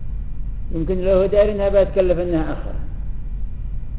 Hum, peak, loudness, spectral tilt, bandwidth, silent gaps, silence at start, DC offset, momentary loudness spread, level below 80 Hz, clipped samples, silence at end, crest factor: none; -4 dBFS; -19 LUFS; -11.5 dB/octave; 4.6 kHz; none; 0 s; 1%; 16 LU; -26 dBFS; under 0.1%; 0 s; 16 dB